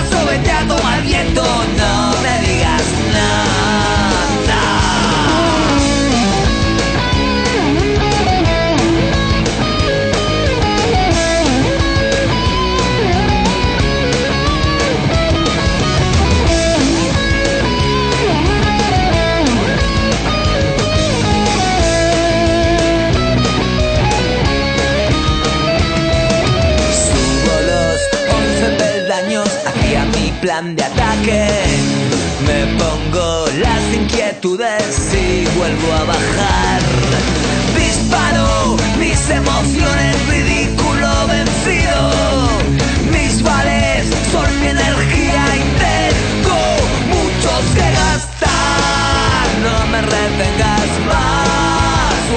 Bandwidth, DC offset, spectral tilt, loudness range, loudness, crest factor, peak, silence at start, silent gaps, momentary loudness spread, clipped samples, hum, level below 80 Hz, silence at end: 9.2 kHz; under 0.1%; -4.5 dB/octave; 2 LU; -13 LUFS; 12 dB; -2 dBFS; 0 s; none; 2 LU; under 0.1%; none; -22 dBFS; 0 s